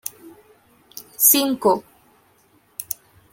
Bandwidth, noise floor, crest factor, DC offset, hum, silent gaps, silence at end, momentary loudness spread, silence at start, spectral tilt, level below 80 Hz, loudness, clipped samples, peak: 17 kHz; -58 dBFS; 24 dB; under 0.1%; none; none; 0.4 s; 25 LU; 0.05 s; -2 dB/octave; -66 dBFS; -18 LUFS; under 0.1%; 0 dBFS